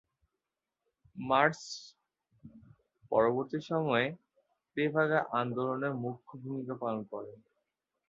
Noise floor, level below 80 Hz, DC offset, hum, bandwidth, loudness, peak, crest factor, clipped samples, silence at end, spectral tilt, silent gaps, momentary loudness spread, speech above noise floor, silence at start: -89 dBFS; -72 dBFS; under 0.1%; none; 7.6 kHz; -32 LUFS; -10 dBFS; 24 dB; under 0.1%; 0.75 s; -4.5 dB/octave; none; 16 LU; 57 dB; 1.15 s